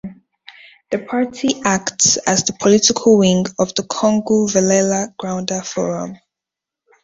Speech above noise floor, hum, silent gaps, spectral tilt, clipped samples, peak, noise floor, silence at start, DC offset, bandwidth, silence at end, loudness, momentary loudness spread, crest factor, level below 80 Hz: 69 dB; none; none; -3.5 dB/octave; under 0.1%; 0 dBFS; -85 dBFS; 0.05 s; under 0.1%; 8 kHz; 0.9 s; -16 LUFS; 11 LU; 16 dB; -54 dBFS